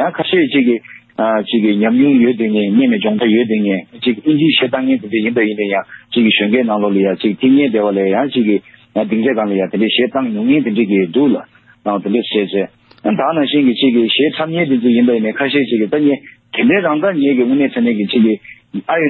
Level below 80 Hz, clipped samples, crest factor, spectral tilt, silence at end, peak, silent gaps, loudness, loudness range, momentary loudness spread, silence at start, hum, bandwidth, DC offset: -60 dBFS; under 0.1%; 12 dB; -10.5 dB/octave; 0 s; -2 dBFS; none; -14 LUFS; 2 LU; 7 LU; 0 s; none; 4.3 kHz; under 0.1%